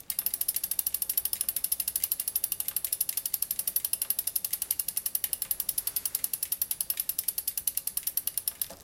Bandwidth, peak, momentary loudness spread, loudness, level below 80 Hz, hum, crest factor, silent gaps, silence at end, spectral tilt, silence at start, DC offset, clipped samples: 17.5 kHz; -8 dBFS; 2 LU; -29 LUFS; -64 dBFS; none; 24 dB; none; 0 s; 1.5 dB/octave; 0 s; under 0.1%; under 0.1%